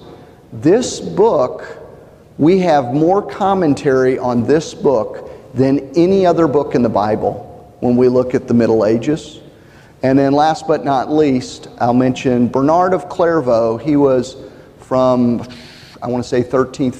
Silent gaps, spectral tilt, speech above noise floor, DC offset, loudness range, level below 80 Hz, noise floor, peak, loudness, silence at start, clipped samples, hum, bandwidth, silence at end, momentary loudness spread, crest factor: none; -7 dB/octave; 28 dB; under 0.1%; 2 LU; -46 dBFS; -42 dBFS; -2 dBFS; -15 LUFS; 0 s; under 0.1%; none; 10 kHz; 0 s; 10 LU; 14 dB